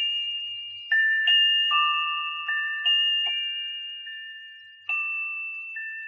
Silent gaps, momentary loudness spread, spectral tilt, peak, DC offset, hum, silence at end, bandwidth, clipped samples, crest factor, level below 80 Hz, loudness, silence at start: none; 17 LU; 10 dB/octave; -12 dBFS; under 0.1%; none; 0 s; 7.2 kHz; under 0.1%; 16 dB; under -90 dBFS; -23 LUFS; 0 s